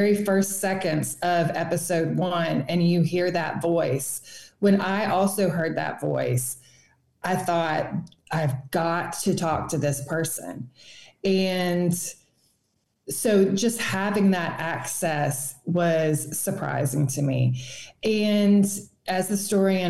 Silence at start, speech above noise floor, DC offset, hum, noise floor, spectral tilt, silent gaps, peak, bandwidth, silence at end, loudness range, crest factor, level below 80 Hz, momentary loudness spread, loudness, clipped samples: 0 s; 48 dB; 0.3%; none; -72 dBFS; -5 dB/octave; none; -10 dBFS; 13 kHz; 0 s; 4 LU; 14 dB; -60 dBFS; 9 LU; -24 LUFS; under 0.1%